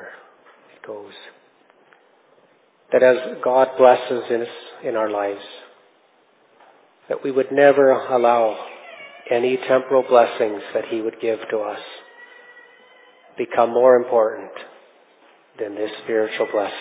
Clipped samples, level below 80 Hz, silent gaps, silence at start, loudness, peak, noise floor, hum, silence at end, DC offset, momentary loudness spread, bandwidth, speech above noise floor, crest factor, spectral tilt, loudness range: under 0.1%; -80 dBFS; none; 0 s; -19 LUFS; 0 dBFS; -58 dBFS; none; 0 s; under 0.1%; 22 LU; 4 kHz; 39 dB; 20 dB; -8.5 dB/octave; 7 LU